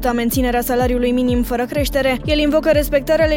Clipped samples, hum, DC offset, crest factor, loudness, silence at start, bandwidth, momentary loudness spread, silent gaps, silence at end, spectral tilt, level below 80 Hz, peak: under 0.1%; none; under 0.1%; 14 dB; -17 LUFS; 0 s; 17 kHz; 4 LU; none; 0 s; -5 dB/octave; -28 dBFS; -4 dBFS